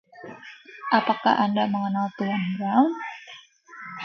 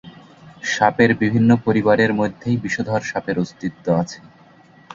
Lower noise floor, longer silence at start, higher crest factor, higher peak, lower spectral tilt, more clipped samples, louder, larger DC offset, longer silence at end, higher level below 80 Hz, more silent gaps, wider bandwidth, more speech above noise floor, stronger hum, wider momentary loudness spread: about the same, -47 dBFS vs -49 dBFS; about the same, 0.15 s vs 0.05 s; about the same, 20 dB vs 18 dB; second, -6 dBFS vs -2 dBFS; about the same, -7 dB/octave vs -6.5 dB/octave; neither; second, -24 LUFS vs -19 LUFS; neither; about the same, 0 s vs 0 s; second, -74 dBFS vs -52 dBFS; neither; second, 6.6 kHz vs 7.6 kHz; second, 23 dB vs 30 dB; neither; first, 21 LU vs 11 LU